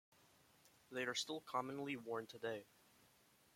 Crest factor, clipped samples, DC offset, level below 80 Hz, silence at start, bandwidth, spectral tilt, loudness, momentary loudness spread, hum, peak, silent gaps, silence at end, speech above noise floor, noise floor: 22 dB; under 0.1%; under 0.1%; -88 dBFS; 0.65 s; 16.5 kHz; -3 dB/octave; -46 LUFS; 6 LU; none; -28 dBFS; none; 0.9 s; 27 dB; -73 dBFS